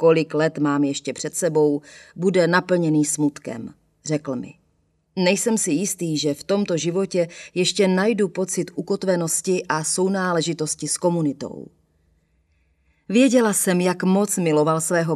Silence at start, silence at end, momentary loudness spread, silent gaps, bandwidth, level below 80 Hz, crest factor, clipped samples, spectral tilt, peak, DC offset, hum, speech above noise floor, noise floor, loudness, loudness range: 0 s; 0 s; 10 LU; none; 14.5 kHz; -66 dBFS; 20 dB; under 0.1%; -4.5 dB/octave; -2 dBFS; under 0.1%; none; 45 dB; -66 dBFS; -21 LUFS; 3 LU